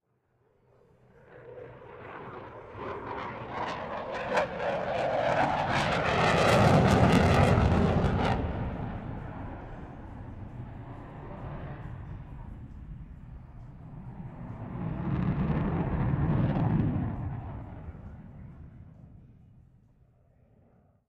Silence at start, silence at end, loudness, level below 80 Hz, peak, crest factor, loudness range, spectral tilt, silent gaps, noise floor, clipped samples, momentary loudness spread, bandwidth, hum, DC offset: 1.3 s; 1.75 s; -28 LUFS; -42 dBFS; -10 dBFS; 22 dB; 20 LU; -7 dB/octave; none; -71 dBFS; under 0.1%; 24 LU; 13.5 kHz; none; under 0.1%